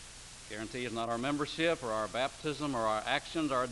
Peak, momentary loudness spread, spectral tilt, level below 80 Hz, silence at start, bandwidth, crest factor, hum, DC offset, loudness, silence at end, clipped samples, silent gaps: -14 dBFS; 10 LU; -4 dB/octave; -58 dBFS; 0 s; 11.5 kHz; 20 dB; none; under 0.1%; -34 LUFS; 0 s; under 0.1%; none